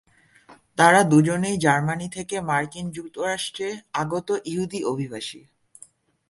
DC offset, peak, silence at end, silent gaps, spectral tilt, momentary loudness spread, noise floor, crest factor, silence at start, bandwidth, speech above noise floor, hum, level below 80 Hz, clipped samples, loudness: under 0.1%; -2 dBFS; 0.9 s; none; -5 dB/octave; 15 LU; -53 dBFS; 22 dB; 0.5 s; 12 kHz; 30 dB; none; -60 dBFS; under 0.1%; -23 LUFS